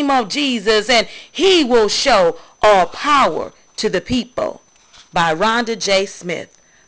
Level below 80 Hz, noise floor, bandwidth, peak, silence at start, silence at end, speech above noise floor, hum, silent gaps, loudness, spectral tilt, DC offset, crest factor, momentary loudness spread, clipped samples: -46 dBFS; -47 dBFS; 8 kHz; -2 dBFS; 0 s; 0.45 s; 31 dB; none; none; -16 LUFS; -3 dB/octave; under 0.1%; 14 dB; 12 LU; under 0.1%